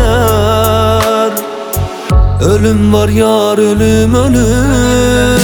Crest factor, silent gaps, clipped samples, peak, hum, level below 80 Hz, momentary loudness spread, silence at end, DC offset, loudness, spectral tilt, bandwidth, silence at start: 8 dB; none; under 0.1%; 0 dBFS; none; -18 dBFS; 6 LU; 0 s; under 0.1%; -10 LUFS; -5.5 dB/octave; over 20 kHz; 0 s